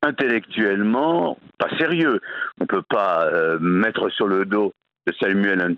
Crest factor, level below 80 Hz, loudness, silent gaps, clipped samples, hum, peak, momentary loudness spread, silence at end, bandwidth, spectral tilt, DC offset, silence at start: 18 dB; -66 dBFS; -21 LUFS; none; under 0.1%; none; -4 dBFS; 7 LU; 0 s; 6.2 kHz; -8 dB/octave; under 0.1%; 0 s